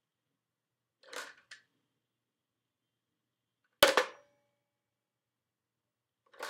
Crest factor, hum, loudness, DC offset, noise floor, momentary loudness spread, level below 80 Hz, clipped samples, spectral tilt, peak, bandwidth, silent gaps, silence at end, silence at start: 34 dB; none; -28 LUFS; under 0.1%; -89 dBFS; 21 LU; -74 dBFS; under 0.1%; -0.5 dB/octave; -6 dBFS; 16 kHz; none; 0 s; 1.15 s